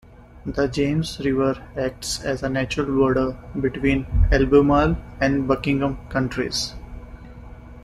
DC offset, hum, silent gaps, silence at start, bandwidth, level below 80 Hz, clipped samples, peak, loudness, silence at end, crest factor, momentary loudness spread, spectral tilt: under 0.1%; 60 Hz at -40 dBFS; none; 0.35 s; 13 kHz; -32 dBFS; under 0.1%; -4 dBFS; -22 LUFS; 0 s; 18 dB; 21 LU; -6 dB/octave